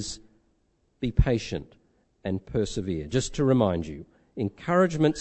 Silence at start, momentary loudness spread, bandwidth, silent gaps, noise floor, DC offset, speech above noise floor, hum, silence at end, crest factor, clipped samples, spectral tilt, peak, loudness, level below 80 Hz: 0 s; 15 LU; 8.6 kHz; none; -69 dBFS; under 0.1%; 43 dB; none; 0 s; 22 dB; under 0.1%; -6 dB/octave; -6 dBFS; -27 LUFS; -38 dBFS